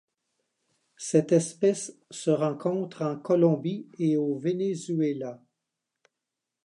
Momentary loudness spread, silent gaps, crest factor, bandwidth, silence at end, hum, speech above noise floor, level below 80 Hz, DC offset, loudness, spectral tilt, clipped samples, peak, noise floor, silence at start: 11 LU; none; 20 dB; 11 kHz; 1.3 s; none; 60 dB; -80 dBFS; under 0.1%; -27 LUFS; -6.5 dB/octave; under 0.1%; -8 dBFS; -86 dBFS; 1 s